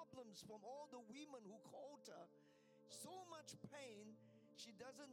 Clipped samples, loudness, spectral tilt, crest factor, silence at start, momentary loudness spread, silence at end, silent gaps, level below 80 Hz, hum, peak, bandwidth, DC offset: under 0.1%; -59 LUFS; -3.5 dB/octave; 16 dB; 0 s; 6 LU; 0 s; none; under -90 dBFS; none; -44 dBFS; 16 kHz; under 0.1%